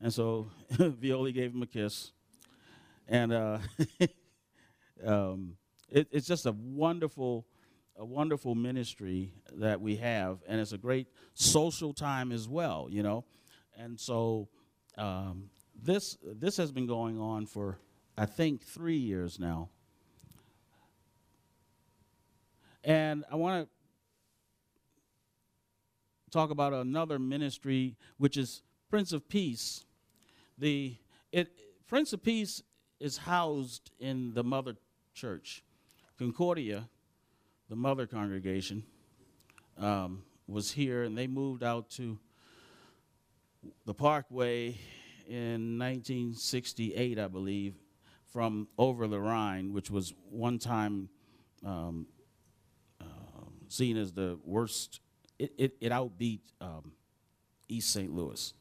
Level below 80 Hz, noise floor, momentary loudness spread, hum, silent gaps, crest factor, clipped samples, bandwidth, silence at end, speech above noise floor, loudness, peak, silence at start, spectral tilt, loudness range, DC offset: -66 dBFS; -78 dBFS; 15 LU; none; none; 24 dB; under 0.1%; 15.5 kHz; 0.1 s; 44 dB; -34 LUFS; -10 dBFS; 0 s; -5 dB/octave; 6 LU; under 0.1%